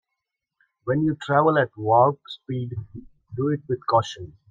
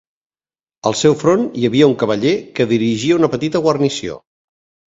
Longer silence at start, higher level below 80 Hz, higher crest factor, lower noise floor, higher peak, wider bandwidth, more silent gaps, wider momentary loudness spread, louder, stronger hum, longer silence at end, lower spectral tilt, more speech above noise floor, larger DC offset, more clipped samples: about the same, 0.85 s vs 0.85 s; second, -60 dBFS vs -54 dBFS; about the same, 18 dB vs 16 dB; second, -83 dBFS vs under -90 dBFS; second, -4 dBFS vs 0 dBFS; about the same, 7.8 kHz vs 8 kHz; neither; first, 17 LU vs 8 LU; second, -23 LUFS vs -16 LUFS; neither; second, 0.2 s vs 0.7 s; first, -7 dB/octave vs -5.5 dB/octave; second, 60 dB vs over 75 dB; neither; neither